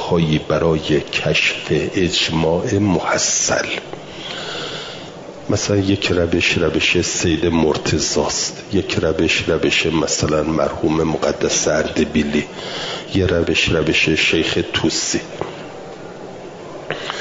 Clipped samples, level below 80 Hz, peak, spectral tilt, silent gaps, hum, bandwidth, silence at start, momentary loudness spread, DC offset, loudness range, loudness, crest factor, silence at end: under 0.1%; -42 dBFS; -4 dBFS; -3.5 dB/octave; none; none; 7.8 kHz; 0 s; 14 LU; 0.1%; 3 LU; -17 LUFS; 14 dB; 0 s